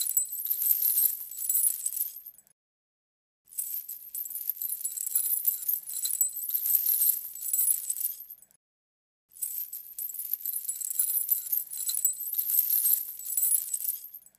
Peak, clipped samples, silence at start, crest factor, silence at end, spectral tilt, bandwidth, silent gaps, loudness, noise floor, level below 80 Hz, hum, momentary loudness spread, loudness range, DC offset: -8 dBFS; under 0.1%; 0 s; 22 dB; 0.2 s; 4.5 dB/octave; 15.5 kHz; 2.52-3.45 s, 8.56-9.29 s; -27 LUFS; under -90 dBFS; -84 dBFS; none; 12 LU; 7 LU; under 0.1%